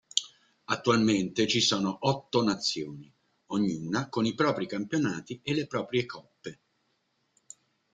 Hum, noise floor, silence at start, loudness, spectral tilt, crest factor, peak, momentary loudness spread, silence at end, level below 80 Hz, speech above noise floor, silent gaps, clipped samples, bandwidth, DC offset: none; -75 dBFS; 0.15 s; -29 LUFS; -4.5 dB/octave; 26 dB; -4 dBFS; 16 LU; 1.4 s; -66 dBFS; 46 dB; none; under 0.1%; 9.6 kHz; under 0.1%